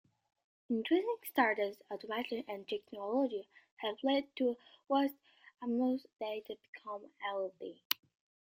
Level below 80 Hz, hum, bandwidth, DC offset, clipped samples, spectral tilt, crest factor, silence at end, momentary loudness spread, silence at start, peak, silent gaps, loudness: -84 dBFS; none; 16 kHz; under 0.1%; under 0.1%; -4 dB/octave; 26 dB; 0.55 s; 14 LU; 0.7 s; -12 dBFS; 3.71-3.77 s, 6.68-6.73 s, 7.85-7.90 s; -37 LUFS